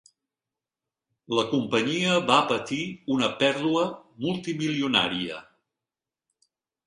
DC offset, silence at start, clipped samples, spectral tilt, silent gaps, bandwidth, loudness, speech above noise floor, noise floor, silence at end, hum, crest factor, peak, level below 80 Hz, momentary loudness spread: under 0.1%; 1.3 s; under 0.1%; -4.5 dB/octave; none; 11 kHz; -25 LUFS; over 65 dB; under -90 dBFS; 1.45 s; none; 22 dB; -6 dBFS; -66 dBFS; 9 LU